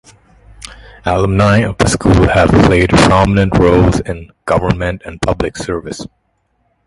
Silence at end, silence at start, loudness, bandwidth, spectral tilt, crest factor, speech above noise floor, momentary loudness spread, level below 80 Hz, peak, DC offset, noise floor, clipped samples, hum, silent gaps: 0.8 s; 0.65 s; -12 LUFS; 11.5 kHz; -6 dB/octave; 12 dB; 50 dB; 18 LU; -26 dBFS; 0 dBFS; under 0.1%; -62 dBFS; under 0.1%; none; none